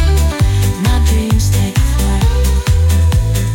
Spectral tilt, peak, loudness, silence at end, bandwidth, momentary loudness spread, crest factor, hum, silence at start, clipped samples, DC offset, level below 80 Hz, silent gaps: -5.5 dB/octave; -2 dBFS; -13 LUFS; 0 s; 17 kHz; 2 LU; 8 dB; none; 0 s; under 0.1%; under 0.1%; -14 dBFS; none